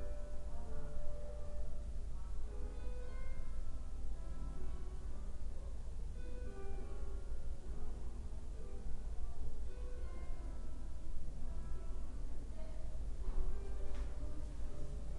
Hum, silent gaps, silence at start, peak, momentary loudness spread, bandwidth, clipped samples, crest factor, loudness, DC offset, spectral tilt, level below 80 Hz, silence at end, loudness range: none; none; 0 s; -24 dBFS; 3 LU; 3.7 kHz; under 0.1%; 14 dB; -49 LUFS; under 0.1%; -7 dB/octave; -42 dBFS; 0 s; 2 LU